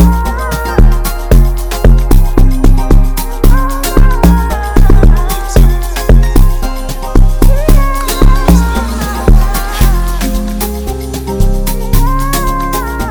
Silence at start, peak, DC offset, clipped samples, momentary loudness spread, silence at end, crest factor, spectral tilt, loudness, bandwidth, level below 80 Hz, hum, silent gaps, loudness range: 0 s; 0 dBFS; under 0.1%; 0.3%; 7 LU; 0 s; 8 dB; -6 dB/octave; -12 LUFS; over 20 kHz; -8 dBFS; none; none; 3 LU